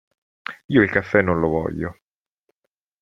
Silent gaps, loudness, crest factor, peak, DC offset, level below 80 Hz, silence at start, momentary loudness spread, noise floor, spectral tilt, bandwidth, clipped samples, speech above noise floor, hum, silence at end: 0.65-0.69 s; -20 LUFS; 22 dB; -2 dBFS; under 0.1%; -50 dBFS; 0.5 s; 18 LU; -79 dBFS; -8.5 dB/octave; 7.4 kHz; under 0.1%; 60 dB; none; 1.1 s